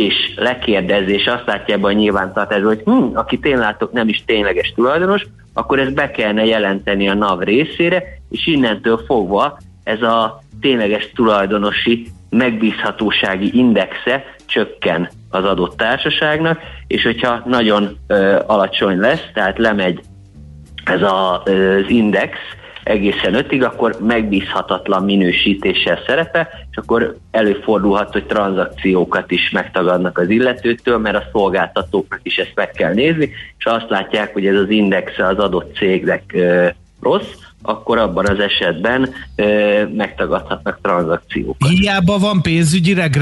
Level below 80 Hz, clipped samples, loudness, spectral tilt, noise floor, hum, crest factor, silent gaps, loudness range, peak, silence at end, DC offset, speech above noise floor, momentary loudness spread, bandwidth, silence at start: -40 dBFS; under 0.1%; -15 LUFS; -6 dB/octave; -37 dBFS; none; 14 dB; none; 1 LU; -2 dBFS; 0 s; under 0.1%; 22 dB; 6 LU; 11.5 kHz; 0 s